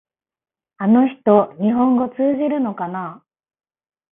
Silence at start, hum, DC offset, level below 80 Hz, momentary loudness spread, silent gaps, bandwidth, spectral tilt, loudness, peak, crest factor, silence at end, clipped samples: 0.8 s; none; under 0.1%; -64 dBFS; 11 LU; none; 3.7 kHz; -12.5 dB/octave; -18 LUFS; 0 dBFS; 18 dB; 0.95 s; under 0.1%